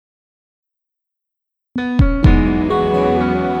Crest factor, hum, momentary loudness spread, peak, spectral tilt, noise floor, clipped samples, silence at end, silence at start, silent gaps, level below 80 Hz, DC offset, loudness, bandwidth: 16 dB; none; 8 LU; 0 dBFS; -9 dB/octave; -81 dBFS; under 0.1%; 0 s; 1.75 s; none; -22 dBFS; under 0.1%; -16 LUFS; 6.8 kHz